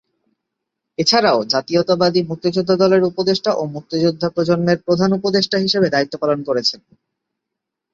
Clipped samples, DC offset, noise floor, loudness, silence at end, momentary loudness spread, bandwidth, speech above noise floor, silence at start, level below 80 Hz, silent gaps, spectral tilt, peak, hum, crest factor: under 0.1%; under 0.1%; -81 dBFS; -17 LUFS; 1.15 s; 6 LU; 7.8 kHz; 64 dB; 1 s; -58 dBFS; none; -5 dB/octave; -2 dBFS; none; 16 dB